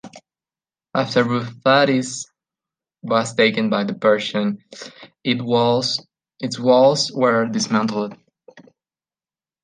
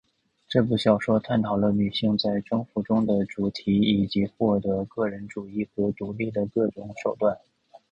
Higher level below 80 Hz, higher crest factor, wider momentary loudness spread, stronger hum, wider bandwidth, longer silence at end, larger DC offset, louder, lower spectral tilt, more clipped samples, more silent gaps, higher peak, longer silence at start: second, -66 dBFS vs -54 dBFS; about the same, 18 dB vs 20 dB; first, 15 LU vs 8 LU; neither; about the same, 9.8 kHz vs 9.2 kHz; first, 1.05 s vs 0.15 s; neither; first, -19 LUFS vs -25 LUFS; second, -4.5 dB/octave vs -7.5 dB/octave; neither; neither; first, -2 dBFS vs -6 dBFS; second, 0.05 s vs 0.5 s